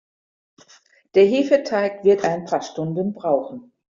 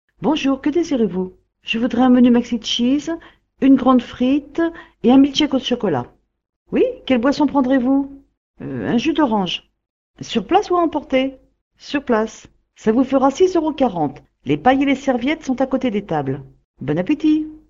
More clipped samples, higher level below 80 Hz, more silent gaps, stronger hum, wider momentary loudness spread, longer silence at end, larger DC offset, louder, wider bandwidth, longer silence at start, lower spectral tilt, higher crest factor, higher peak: neither; second, -64 dBFS vs -48 dBFS; second, none vs 6.49-6.66 s, 8.37-8.54 s, 9.90-10.14 s, 11.61-11.71 s, 16.65-16.74 s; neither; about the same, 10 LU vs 12 LU; first, 0.3 s vs 0.15 s; neither; about the same, -20 LUFS vs -18 LUFS; about the same, 7.4 kHz vs 7.4 kHz; first, 1.15 s vs 0.2 s; about the same, -5 dB/octave vs -5.5 dB/octave; about the same, 16 dB vs 18 dB; second, -4 dBFS vs 0 dBFS